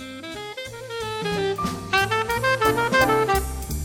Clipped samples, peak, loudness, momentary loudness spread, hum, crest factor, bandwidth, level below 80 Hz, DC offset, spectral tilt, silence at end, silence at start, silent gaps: under 0.1%; -6 dBFS; -22 LUFS; 14 LU; none; 18 dB; 17.5 kHz; -38 dBFS; under 0.1%; -4 dB/octave; 0 s; 0 s; none